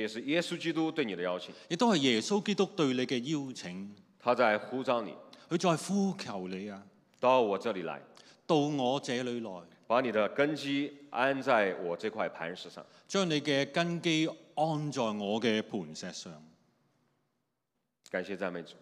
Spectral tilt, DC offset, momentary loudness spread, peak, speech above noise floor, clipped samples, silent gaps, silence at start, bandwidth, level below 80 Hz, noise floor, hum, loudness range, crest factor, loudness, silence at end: -5 dB/octave; under 0.1%; 14 LU; -12 dBFS; 52 dB; under 0.1%; none; 0 s; 13.5 kHz; -88 dBFS; -84 dBFS; none; 4 LU; 20 dB; -32 LUFS; 0.1 s